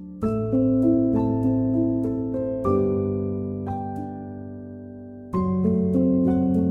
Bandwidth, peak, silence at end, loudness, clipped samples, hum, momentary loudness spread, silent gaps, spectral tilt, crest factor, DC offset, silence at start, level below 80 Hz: 2.8 kHz; -10 dBFS; 0 s; -23 LUFS; under 0.1%; none; 16 LU; none; -12 dB/octave; 12 dB; under 0.1%; 0 s; -46 dBFS